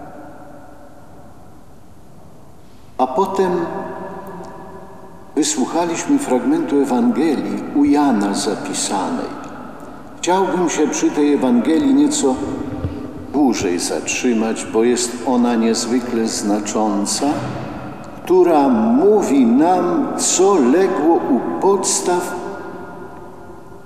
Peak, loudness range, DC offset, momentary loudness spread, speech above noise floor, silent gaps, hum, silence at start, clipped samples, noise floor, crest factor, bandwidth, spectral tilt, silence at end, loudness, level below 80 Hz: -4 dBFS; 9 LU; 1%; 19 LU; 28 dB; none; none; 0 s; under 0.1%; -44 dBFS; 14 dB; 15 kHz; -4 dB/octave; 0.05 s; -17 LUFS; -50 dBFS